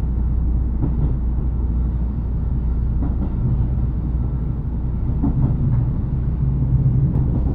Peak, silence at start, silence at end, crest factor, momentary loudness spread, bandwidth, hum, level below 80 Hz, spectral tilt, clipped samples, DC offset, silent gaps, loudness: -6 dBFS; 0 s; 0 s; 12 dB; 5 LU; 2.2 kHz; none; -22 dBFS; -13 dB/octave; under 0.1%; under 0.1%; none; -21 LUFS